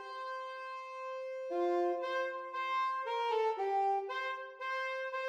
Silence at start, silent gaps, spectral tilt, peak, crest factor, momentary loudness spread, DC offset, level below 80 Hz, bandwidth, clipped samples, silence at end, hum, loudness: 0 s; none; -1.5 dB/octave; -24 dBFS; 12 dB; 9 LU; under 0.1%; under -90 dBFS; 9.4 kHz; under 0.1%; 0 s; none; -36 LUFS